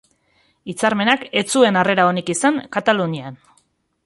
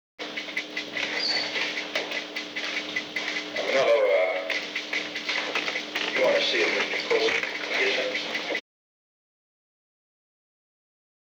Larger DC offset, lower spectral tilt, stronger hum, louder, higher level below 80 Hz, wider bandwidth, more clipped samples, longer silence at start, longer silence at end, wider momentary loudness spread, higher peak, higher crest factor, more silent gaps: neither; first, -4 dB/octave vs -1.5 dB/octave; neither; first, -17 LUFS vs -26 LUFS; first, -62 dBFS vs -80 dBFS; second, 11.5 kHz vs over 20 kHz; neither; first, 0.65 s vs 0.2 s; second, 0.7 s vs 2.8 s; first, 15 LU vs 9 LU; first, -2 dBFS vs -12 dBFS; about the same, 18 dB vs 16 dB; neither